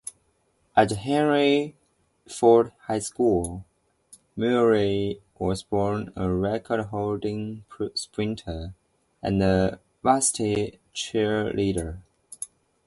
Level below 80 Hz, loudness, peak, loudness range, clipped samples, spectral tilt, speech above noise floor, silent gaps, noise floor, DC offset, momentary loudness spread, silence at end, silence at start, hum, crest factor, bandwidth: -46 dBFS; -25 LUFS; -6 dBFS; 5 LU; under 0.1%; -5 dB/octave; 44 dB; none; -68 dBFS; under 0.1%; 16 LU; 0.4 s; 0.05 s; none; 20 dB; 11.5 kHz